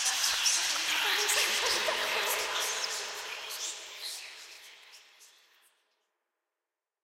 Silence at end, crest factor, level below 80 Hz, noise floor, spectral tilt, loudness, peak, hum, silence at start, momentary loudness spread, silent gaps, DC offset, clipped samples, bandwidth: 1.8 s; 20 dB; -72 dBFS; under -90 dBFS; 2.5 dB/octave; -29 LUFS; -14 dBFS; none; 0 s; 17 LU; none; under 0.1%; under 0.1%; 16 kHz